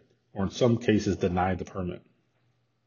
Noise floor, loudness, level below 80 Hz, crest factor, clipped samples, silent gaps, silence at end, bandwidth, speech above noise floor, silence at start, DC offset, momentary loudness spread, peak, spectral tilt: -71 dBFS; -28 LUFS; -58 dBFS; 20 dB; under 0.1%; none; 0.9 s; 7.2 kHz; 44 dB; 0.35 s; under 0.1%; 13 LU; -8 dBFS; -6 dB/octave